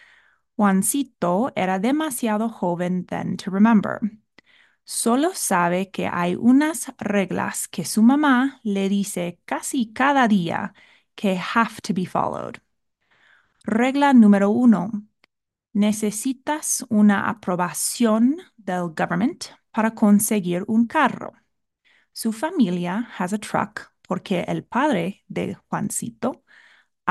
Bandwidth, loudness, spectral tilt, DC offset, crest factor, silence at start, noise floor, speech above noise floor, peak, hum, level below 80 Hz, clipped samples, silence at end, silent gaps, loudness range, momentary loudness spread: 12.5 kHz; -21 LUFS; -5 dB/octave; under 0.1%; 16 dB; 0.6 s; -69 dBFS; 48 dB; -4 dBFS; none; -64 dBFS; under 0.1%; 0 s; none; 6 LU; 12 LU